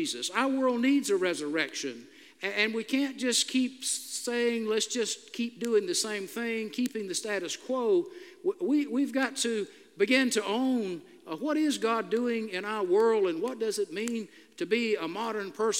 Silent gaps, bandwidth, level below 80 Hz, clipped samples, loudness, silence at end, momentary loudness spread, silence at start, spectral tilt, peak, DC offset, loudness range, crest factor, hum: none; 16 kHz; under -90 dBFS; under 0.1%; -29 LUFS; 0 s; 9 LU; 0 s; -2.5 dB/octave; -10 dBFS; under 0.1%; 2 LU; 20 dB; none